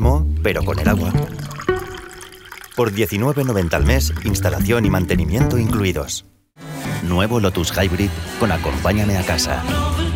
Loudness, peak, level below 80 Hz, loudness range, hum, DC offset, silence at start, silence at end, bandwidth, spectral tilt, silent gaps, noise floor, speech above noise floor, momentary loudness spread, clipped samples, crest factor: -19 LUFS; -2 dBFS; -26 dBFS; 3 LU; none; under 0.1%; 0 s; 0 s; 17 kHz; -5.5 dB/octave; none; -38 dBFS; 20 dB; 10 LU; under 0.1%; 16 dB